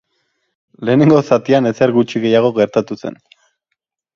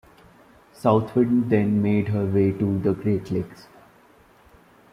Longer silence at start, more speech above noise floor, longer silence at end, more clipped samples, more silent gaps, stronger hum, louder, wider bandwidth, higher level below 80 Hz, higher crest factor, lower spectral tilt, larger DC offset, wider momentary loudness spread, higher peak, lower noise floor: about the same, 0.8 s vs 0.85 s; first, 61 dB vs 33 dB; second, 1 s vs 1.3 s; neither; neither; neither; first, -14 LUFS vs -22 LUFS; second, 7.4 kHz vs 11.5 kHz; about the same, -58 dBFS vs -56 dBFS; about the same, 16 dB vs 18 dB; second, -7.5 dB/octave vs -9.5 dB/octave; neither; first, 14 LU vs 6 LU; first, 0 dBFS vs -4 dBFS; first, -75 dBFS vs -54 dBFS